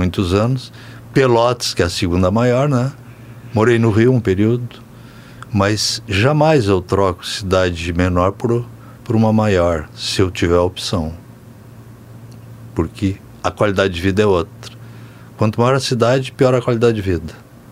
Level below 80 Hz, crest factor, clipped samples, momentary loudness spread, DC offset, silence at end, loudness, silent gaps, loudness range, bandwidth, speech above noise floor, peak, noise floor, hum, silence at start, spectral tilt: -40 dBFS; 16 dB; under 0.1%; 15 LU; under 0.1%; 0 s; -16 LUFS; none; 5 LU; 15.5 kHz; 23 dB; 0 dBFS; -39 dBFS; none; 0 s; -6 dB/octave